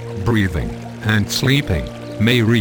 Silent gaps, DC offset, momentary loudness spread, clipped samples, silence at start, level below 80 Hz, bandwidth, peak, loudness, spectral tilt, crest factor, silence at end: none; under 0.1%; 10 LU; under 0.1%; 0 s; -34 dBFS; 19.5 kHz; -2 dBFS; -18 LUFS; -5.5 dB/octave; 16 dB; 0 s